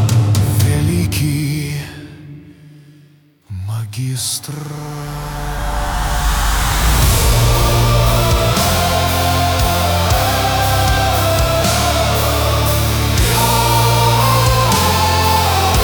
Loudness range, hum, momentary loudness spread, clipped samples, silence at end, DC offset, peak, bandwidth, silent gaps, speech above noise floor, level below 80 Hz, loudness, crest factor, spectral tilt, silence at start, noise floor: 11 LU; none; 12 LU; under 0.1%; 0 s; under 0.1%; -2 dBFS; over 20 kHz; none; 25 dB; -22 dBFS; -14 LUFS; 12 dB; -4 dB/octave; 0 s; -48 dBFS